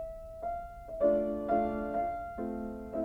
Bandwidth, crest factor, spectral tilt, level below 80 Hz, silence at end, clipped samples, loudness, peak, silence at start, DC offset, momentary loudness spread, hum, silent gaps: 5.2 kHz; 18 dB; -9 dB/octave; -52 dBFS; 0 s; under 0.1%; -34 LUFS; -16 dBFS; 0 s; under 0.1%; 12 LU; none; none